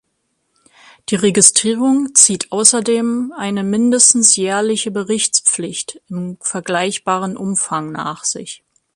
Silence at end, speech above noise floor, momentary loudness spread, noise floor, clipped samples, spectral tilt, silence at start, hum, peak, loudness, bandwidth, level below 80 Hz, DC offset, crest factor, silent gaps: 0.4 s; 53 dB; 15 LU; -68 dBFS; under 0.1%; -2.5 dB/octave; 1.1 s; none; 0 dBFS; -14 LUFS; 15.5 kHz; -60 dBFS; under 0.1%; 16 dB; none